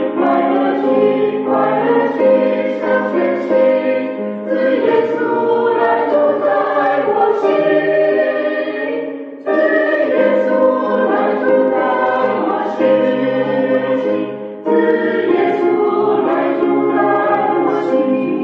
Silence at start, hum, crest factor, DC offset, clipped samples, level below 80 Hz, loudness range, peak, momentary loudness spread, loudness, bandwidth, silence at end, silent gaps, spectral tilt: 0 s; none; 12 dB; under 0.1%; under 0.1%; -68 dBFS; 1 LU; -2 dBFS; 5 LU; -15 LUFS; 6 kHz; 0 s; none; -8 dB/octave